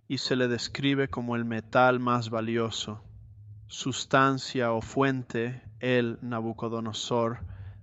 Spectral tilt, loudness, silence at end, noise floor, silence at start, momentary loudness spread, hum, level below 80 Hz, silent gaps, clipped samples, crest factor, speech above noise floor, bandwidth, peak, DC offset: -5 dB/octave; -28 LUFS; 0 s; -48 dBFS; 0.1 s; 11 LU; none; -58 dBFS; none; under 0.1%; 20 dB; 20 dB; 8.2 kHz; -8 dBFS; under 0.1%